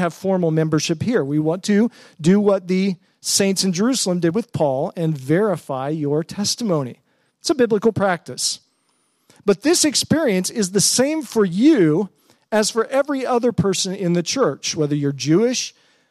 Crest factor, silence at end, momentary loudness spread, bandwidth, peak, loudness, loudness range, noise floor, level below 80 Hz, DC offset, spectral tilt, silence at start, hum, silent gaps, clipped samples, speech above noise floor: 16 dB; 0.4 s; 7 LU; 15 kHz; -4 dBFS; -19 LUFS; 4 LU; -65 dBFS; -60 dBFS; under 0.1%; -4.5 dB/octave; 0 s; none; none; under 0.1%; 46 dB